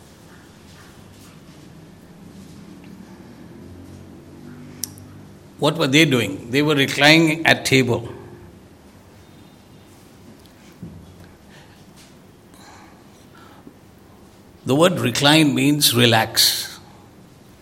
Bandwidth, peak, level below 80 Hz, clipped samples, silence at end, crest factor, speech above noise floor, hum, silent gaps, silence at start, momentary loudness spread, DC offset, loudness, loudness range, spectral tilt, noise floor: 16.5 kHz; 0 dBFS; -58 dBFS; under 0.1%; 0.8 s; 22 dB; 31 dB; none; none; 1.5 s; 28 LU; under 0.1%; -16 LUFS; 21 LU; -4 dB/octave; -47 dBFS